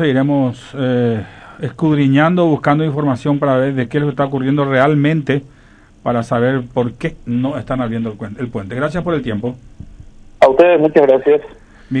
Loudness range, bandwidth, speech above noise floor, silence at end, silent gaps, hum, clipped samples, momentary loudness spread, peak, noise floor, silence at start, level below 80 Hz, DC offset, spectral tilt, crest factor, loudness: 6 LU; 9.8 kHz; 30 dB; 0 s; none; none; 0.1%; 13 LU; 0 dBFS; -45 dBFS; 0 s; -44 dBFS; under 0.1%; -8.5 dB/octave; 16 dB; -15 LUFS